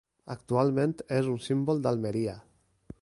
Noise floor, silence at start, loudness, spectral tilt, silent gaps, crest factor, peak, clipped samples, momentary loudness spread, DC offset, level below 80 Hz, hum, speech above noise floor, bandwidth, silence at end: -51 dBFS; 0.25 s; -29 LUFS; -7.5 dB/octave; none; 18 dB; -12 dBFS; under 0.1%; 14 LU; under 0.1%; -62 dBFS; none; 23 dB; 11.5 kHz; 0.6 s